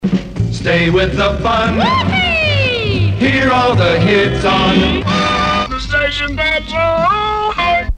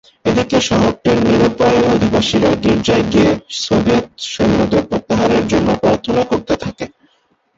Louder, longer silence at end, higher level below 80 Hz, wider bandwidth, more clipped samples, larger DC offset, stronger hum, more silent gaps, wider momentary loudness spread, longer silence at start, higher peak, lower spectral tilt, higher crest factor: about the same, -13 LUFS vs -14 LUFS; second, 0 s vs 0.7 s; first, -28 dBFS vs -36 dBFS; first, 10 kHz vs 8 kHz; neither; first, 0.2% vs under 0.1%; neither; neither; about the same, 4 LU vs 6 LU; second, 0 s vs 0.25 s; about the same, 0 dBFS vs -2 dBFS; about the same, -6 dB/octave vs -5.5 dB/octave; about the same, 14 dB vs 12 dB